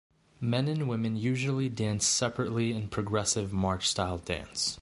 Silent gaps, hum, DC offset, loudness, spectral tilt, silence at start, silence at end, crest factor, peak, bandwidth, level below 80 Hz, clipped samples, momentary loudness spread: none; none; under 0.1%; -30 LUFS; -4 dB/octave; 0.4 s; 0 s; 18 dB; -12 dBFS; 11.5 kHz; -50 dBFS; under 0.1%; 6 LU